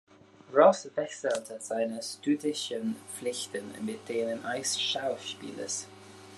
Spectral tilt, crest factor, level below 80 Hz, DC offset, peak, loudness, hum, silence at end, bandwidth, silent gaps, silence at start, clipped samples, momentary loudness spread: -3 dB/octave; 24 dB; -84 dBFS; under 0.1%; -6 dBFS; -31 LUFS; none; 0 s; 12.5 kHz; none; 0.5 s; under 0.1%; 15 LU